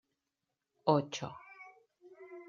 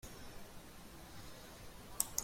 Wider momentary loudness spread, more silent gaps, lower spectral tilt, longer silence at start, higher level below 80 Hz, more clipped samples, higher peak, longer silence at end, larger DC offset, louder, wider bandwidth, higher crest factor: first, 24 LU vs 15 LU; neither; first, -6 dB/octave vs -1.5 dB/octave; first, 0.85 s vs 0 s; second, -78 dBFS vs -60 dBFS; neither; about the same, -12 dBFS vs -12 dBFS; about the same, 0.05 s vs 0 s; neither; first, -34 LUFS vs -48 LUFS; second, 7.4 kHz vs 16.5 kHz; second, 26 dB vs 34 dB